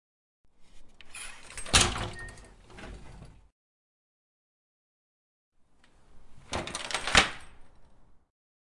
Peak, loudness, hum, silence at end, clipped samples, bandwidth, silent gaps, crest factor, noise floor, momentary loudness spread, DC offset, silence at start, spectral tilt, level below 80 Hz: -8 dBFS; -26 LUFS; none; 0.5 s; under 0.1%; 11.5 kHz; 3.52-5.52 s; 26 dB; -60 dBFS; 24 LU; under 0.1%; 0.6 s; -1.5 dB/octave; -46 dBFS